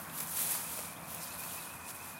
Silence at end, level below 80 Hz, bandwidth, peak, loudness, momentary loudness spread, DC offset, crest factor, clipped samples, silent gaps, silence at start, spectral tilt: 0 s; -70 dBFS; 17 kHz; -16 dBFS; -37 LUFS; 10 LU; under 0.1%; 24 dB; under 0.1%; none; 0 s; -1 dB/octave